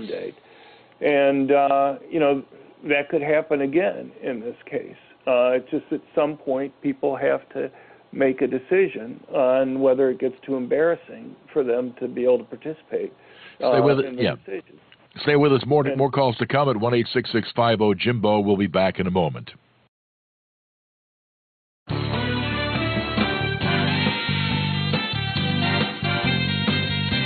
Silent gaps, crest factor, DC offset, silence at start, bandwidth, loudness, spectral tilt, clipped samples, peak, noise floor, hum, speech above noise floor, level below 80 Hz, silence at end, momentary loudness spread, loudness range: 19.88-21.86 s; 18 dB; under 0.1%; 0 s; 4.8 kHz; -22 LUFS; -10 dB/octave; under 0.1%; -4 dBFS; -49 dBFS; none; 28 dB; -48 dBFS; 0 s; 12 LU; 5 LU